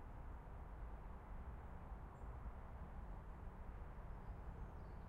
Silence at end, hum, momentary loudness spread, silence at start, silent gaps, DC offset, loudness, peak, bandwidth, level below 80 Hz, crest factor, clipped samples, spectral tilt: 0 s; none; 2 LU; 0 s; none; under 0.1%; -56 LUFS; -38 dBFS; 7.8 kHz; -54 dBFS; 14 dB; under 0.1%; -8.5 dB/octave